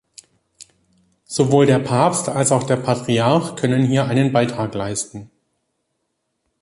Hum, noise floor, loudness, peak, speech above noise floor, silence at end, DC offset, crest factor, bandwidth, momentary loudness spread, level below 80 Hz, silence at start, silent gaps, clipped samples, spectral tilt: none; -73 dBFS; -18 LUFS; -2 dBFS; 56 dB; 1.35 s; under 0.1%; 18 dB; 11.5 kHz; 10 LU; -56 dBFS; 1.3 s; none; under 0.1%; -5.5 dB/octave